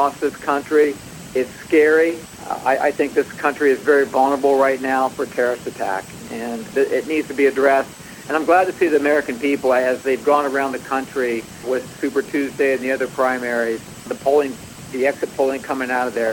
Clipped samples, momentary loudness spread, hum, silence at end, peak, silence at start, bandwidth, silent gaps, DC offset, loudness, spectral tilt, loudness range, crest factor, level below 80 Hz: under 0.1%; 10 LU; none; 0 s; -2 dBFS; 0 s; 18 kHz; none; under 0.1%; -19 LUFS; -4.5 dB/octave; 3 LU; 18 dB; -56 dBFS